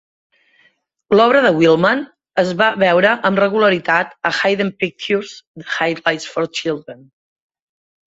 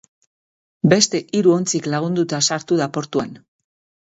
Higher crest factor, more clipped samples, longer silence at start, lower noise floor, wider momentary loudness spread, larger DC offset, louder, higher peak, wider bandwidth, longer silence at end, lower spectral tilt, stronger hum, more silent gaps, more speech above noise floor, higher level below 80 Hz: about the same, 16 dB vs 20 dB; neither; first, 1.1 s vs 0.85 s; second, -59 dBFS vs under -90 dBFS; about the same, 11 LU vs 9 LU; neither; about the same, -16 LUFS vs -18 LUFS; about the same, 0 dBFS vs 0 dBFS; about the same, 8 kHz vs 8 kHz; first, 1.2 s vs 0.75 s; about the same, -5 dB/octave vs -4 dB/octave; neither; first, 5.47-5.54 s vs none; second, 43 dB vs over 72 dB; about the same, -60 dBFS vs -60 dBFS